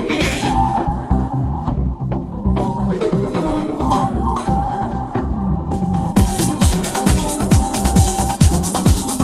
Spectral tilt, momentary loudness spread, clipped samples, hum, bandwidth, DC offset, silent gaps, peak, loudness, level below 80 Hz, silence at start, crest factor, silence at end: -5.5 dB/octave; 6 LU; under 0.1%; none; 15 kHz; under 0.1%; none; 0 dBFS; -18 LUFS; -24 dBFS; 0 s; 16 dB; 0 s